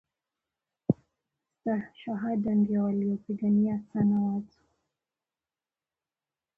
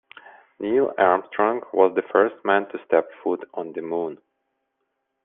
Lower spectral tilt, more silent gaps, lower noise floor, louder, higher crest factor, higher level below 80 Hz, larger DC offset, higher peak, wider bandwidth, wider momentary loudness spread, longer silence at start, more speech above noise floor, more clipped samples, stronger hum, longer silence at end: first, -11 dB/octave vs -3.5 dB/octave; neither; first, under -90 dBFS vs -77 dBFS; second, -29 LUFS vs -23 LUFS; about the same, 20 dB vs 20 dB; about the same, -66 dBFS vs -70 dBFS; neither; second, -10 dBFS vs -4 dBFS; second, 3.3 kHz vs 3.8 kHz; about the same, 9 LU vs 11 LU; first, 0.9 s vs 0.6 s; first, over 62 dB vs 55 dB; neither; neither; first, 2.1 s vs 1.1 s